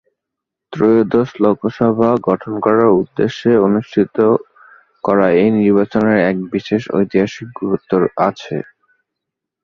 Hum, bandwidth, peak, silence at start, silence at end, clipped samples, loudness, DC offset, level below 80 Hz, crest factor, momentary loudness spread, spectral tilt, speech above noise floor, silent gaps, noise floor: none; 7 kHz; 0 dBFS; 0.7 s; 1 s; under 0.1%; -15 LUFS; under 0.1%; -52 dBFS; 14 dB; 9 LU; -8 dB/octave; 67 dB; none; -81 dBFS